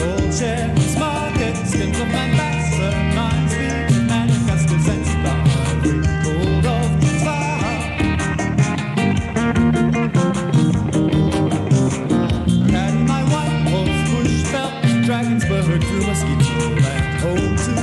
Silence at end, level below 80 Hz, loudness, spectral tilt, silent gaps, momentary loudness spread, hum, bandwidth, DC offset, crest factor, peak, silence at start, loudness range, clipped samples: 0 s; -30 dBFS; -18 LUFS; -6 dB/octave; none; 3 LU; none; 12 kHz; under 0.1%; 14 dB; -4 dBFS; 0 s; 1 LU; under 0.1%